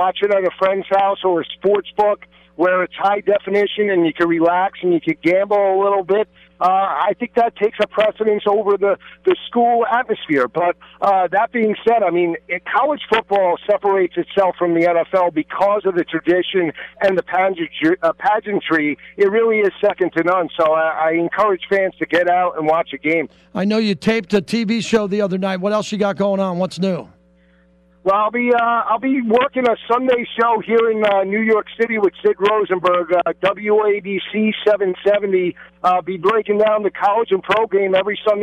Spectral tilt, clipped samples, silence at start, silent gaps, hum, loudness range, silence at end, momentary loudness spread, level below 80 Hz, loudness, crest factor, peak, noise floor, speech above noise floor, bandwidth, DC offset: -6 dB/octave; under 0.1%; 0 s; none; none; 2 LU; 0 s; 4 LU; -58 dBFS; -17 LUFS; 12 dB; -6 dBFS; -53 dBFS; 36 dB; 10.5 kHz; under 0.1%